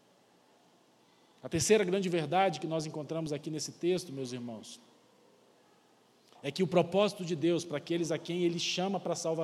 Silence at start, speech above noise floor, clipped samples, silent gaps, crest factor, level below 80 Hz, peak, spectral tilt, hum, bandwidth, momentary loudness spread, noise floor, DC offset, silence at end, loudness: 1.45 s; 34 dB; under 0.1%; none; 22 dB; -70 dBFS; -12 dBFS; -4.5 dB/octave; none; 14 kHz; 13 LU; -65 dBFS; under 0.1%; 0 s; -32 LUFS